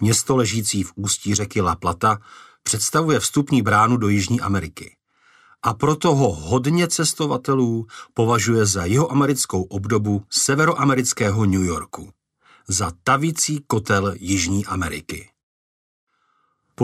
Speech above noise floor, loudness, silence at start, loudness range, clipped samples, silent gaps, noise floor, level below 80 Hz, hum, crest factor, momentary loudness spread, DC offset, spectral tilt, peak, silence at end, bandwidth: 47 dB; -20 LUFS; 0 s; 3 LU; under 0.1%; 15.43-16.07 s; -66 dBFS; -48 dBFS; none; 16 dB; 8 LU; under 0.1%; -4.5 dB/octave; -4 dBFS; 0 s; 15.5 kHz